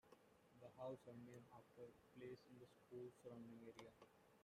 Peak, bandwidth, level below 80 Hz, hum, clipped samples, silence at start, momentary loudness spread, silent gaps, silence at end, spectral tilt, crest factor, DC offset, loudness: -42 dBFS; 15 kHz; -90 dBFS; none; under 0.1%; 0.05 s; 11 LU; none; 0 s; -6.5 dB/octave; 18 dB; under 0.1%; -61 LUFS